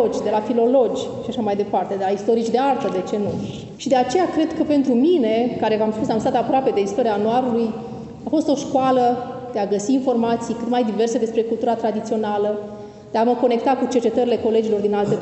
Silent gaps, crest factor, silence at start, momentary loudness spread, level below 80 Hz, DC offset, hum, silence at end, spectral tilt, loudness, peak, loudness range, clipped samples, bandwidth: none; 14 dB; 0 s; 8 LU; -58 dBFS; under 0.1%; none; 0 s; -6 dB/octave; -20 LUFS; -6 dBFS; 2 LU; under 0.1%; 8.4 kHz